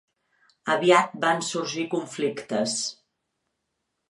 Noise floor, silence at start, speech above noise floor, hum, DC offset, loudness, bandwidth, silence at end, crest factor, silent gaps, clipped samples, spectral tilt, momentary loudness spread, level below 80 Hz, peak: -79 dBFS; 0.65 s; 55 dB; none; under 0.1%; -25 LUFS; 11.5 kHz; 1.15 s; 24 dB; none; under 0.1%; -3.5 dB/octave; 10 LU; -78 dBFS; -4 dBFS